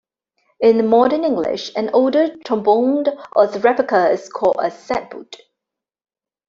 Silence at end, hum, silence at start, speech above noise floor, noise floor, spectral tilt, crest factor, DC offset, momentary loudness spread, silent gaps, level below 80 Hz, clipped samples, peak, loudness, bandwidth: 1.15 s; none; 0.6 s; 67 dB; -84 dBFS; -5.5 dB/octave; 16 dB; under 0.1%; 9 LU; none; -62 dBFS; under 0.1%; -2 dBFS; -17 LUFS; 7.6 kHz